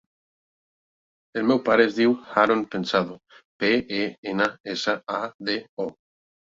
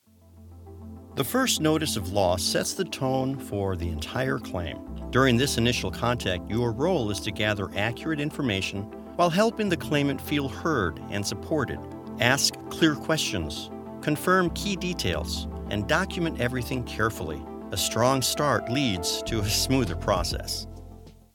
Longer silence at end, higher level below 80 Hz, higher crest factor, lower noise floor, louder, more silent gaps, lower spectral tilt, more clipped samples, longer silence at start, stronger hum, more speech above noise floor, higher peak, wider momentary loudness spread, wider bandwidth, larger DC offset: first, 0.65 s vs 0.25 s; second, -64 dBFS vs -44 dBFS; about the same, 22 dB vs 24 dB; first, under -90 dBFS vs -51 dBFS; about the same, -24 LUFS vs -26 LUFS; first, 3.45-3.60 s, 4.18-4.23 s, 4.60-4.64 s, 5.34-5.39 s, 5.69-5.77 s vs none; about the same, -5 dB/octave vs -4 dB/octave; neither; first, 1.35 s vs 0.35 s; neither; first, over 67 dB vs 25 dB; about the same, -4 dBFS vs -2 dBFS; about the same, 11 LU vs 10 LU; second, 7.8 kHz vs 18 kHz; neither